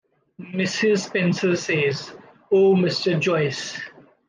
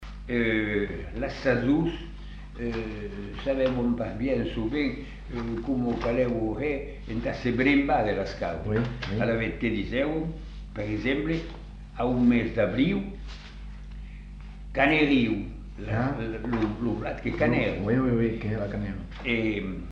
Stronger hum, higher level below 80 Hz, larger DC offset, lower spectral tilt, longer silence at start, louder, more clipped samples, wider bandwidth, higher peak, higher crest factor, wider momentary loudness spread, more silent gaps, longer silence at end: neither; second, -68 dBFS vs -40 dBFS; neither; second, -5.5 dB/octave vs -8 dB/octave; first, 0.4 s vs 0 s; first, -21 LUFS vs -27 LUFS; neither; first, 9.6 kHz vs 7.4 kHz; about the same, -8 dBFS vs -10 dBFS; about the same, 14 dB vs 18 dB; second, 14 LU vs 18 LU; neither; first, 0.4 s vs 0 s